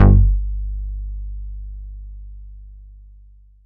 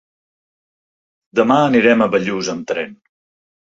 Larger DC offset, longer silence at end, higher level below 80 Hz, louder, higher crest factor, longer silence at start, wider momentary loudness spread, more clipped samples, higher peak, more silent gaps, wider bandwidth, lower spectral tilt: neither; about the same, 0.7 s vs 0.75 s; first, -22 dBFS vs -58 dBFS; second, -22 LUFS vs -16 LUFS; about the same, 18 dB vs 18 dB; second, 0 s vs 1.35 s; first, 25 LU vs 11 LU; neither; about the same, -2 dBFS vs 0 dBFS; neither; second, 2.4 kHz vs 7.8 kHz; first, -9 dB/octave vs -5 dB/octave